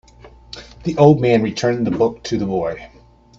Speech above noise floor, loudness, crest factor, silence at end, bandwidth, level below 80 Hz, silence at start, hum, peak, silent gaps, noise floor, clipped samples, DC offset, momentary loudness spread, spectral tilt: 28 dB; -17 LUFS; 18 dB; 0.55 s; 7.8 kHz; -46 dBFS; 0.25 s; none; 0 dBFS; none; -44 dBFS; under 0.1%; under 0.1%; 22 LU; -7 dB/octave